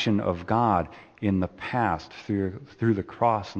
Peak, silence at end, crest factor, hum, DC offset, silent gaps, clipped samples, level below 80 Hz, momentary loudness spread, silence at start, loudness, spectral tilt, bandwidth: -8 dBFS; 0 s; 18 dB; none; under 0.1%; none; under 0.1%; -54 dBFS; 7 LU; 0 s; -27 LUFS; -7.5 dB/octave; 8.2 kHz